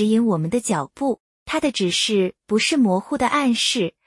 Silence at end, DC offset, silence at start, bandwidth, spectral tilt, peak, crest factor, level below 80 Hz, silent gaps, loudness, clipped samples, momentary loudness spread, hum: 0.15 s; under 0.1%; 0 s; 12 kHz; -4 dB/octave; -6 dBFS; 16 dB; -56 dBFS; 1.20-1.46 s; -20 LUFS; under 0.1%; 7 LU; none